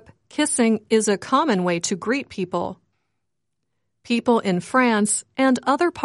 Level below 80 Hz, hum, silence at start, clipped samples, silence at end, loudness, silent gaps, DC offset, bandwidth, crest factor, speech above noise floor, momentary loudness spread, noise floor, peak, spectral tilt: -64 dBFS; none; 0.35 s; under 0.1%; 0 s; -21 LUFS; none; under 0.1%; 11.5 kHz; 18 dB; 59 dB; 8 LU; -80 dBFS; -4 dBFS; -4 dB/octave